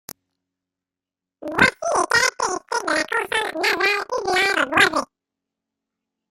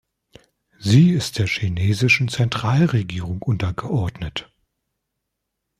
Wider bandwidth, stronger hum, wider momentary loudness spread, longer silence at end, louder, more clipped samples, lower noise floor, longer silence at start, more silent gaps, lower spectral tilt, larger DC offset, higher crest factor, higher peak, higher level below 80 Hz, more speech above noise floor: first, 16.5 kHz vs 14 kHz; neither; second, 9 LU vs 13 LU; about the same, 1.25 s vs 1.35 s; about the same, -19 LUFS vs -20 LUFS; neither; first, -88 dBFS vs -79 dBFS; first, 1.4 s vs 0.8 s; neither; second, -2 dB/octave vs -6 dB/octave; neither; about the same, 22 dB vs 18 dB; about the same, -2 dBFS vs -4 dBFS; second, -56 dBFS vs -48 dBFS; first, 68 dB vs 60 dB